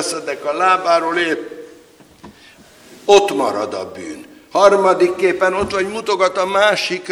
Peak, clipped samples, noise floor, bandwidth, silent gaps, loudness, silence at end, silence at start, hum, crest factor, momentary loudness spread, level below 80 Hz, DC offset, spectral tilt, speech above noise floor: 0 dBFS; under 0.1%; -46 dBFS; 15 kHz; none; -16 LUFS; 0 s; 0 s; none; 16 dB; 16 LU; -52 dBFS; under 0.1%; -3 dB/octave; 30 dB